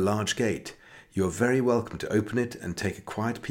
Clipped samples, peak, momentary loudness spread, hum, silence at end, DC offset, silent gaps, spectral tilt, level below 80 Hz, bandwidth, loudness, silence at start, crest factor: under 0.1%; -12 dBFS; 8 LU; none; 0 s; under 0.1%; none; -5.5 dB/octave; -56 dBFS; 17.5 kHz; -28 LUFS; 0 s; 16 dB